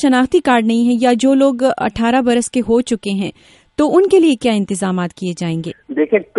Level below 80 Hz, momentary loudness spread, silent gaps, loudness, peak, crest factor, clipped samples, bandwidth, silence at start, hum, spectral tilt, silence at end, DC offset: -48 dBFS; 10 LU; none; -15 LUFS; 0 dBFS; 14 dB; under 0.1%; 11.5 kHz; 0 s; none; -5.5 dB/octave; 0 s; under 0.1%